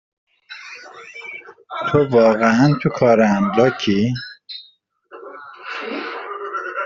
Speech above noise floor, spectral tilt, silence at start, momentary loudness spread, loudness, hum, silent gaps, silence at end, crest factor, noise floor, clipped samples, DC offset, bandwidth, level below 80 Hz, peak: 38 dB; -7 dB/octave; 0.5 s; 22 LU; -17 LUFS; none; none; 0 s; 18 dB; -54 dBFS; under 0.1%; under 0.1%; 7.4 kHz; -56 dBFS; -2 dBFS